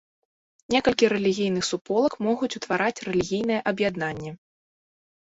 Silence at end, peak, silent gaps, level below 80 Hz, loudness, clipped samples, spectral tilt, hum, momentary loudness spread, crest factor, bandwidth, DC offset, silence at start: 1.05 s; -6 dBFS; 1.81-1.85 s; -58 dBFS; -24 LUFS; under 0.1%; -4.5 dB/octave; none; 7 LU; 20 dB; 8 kHz; under 0.1%; 0.7 s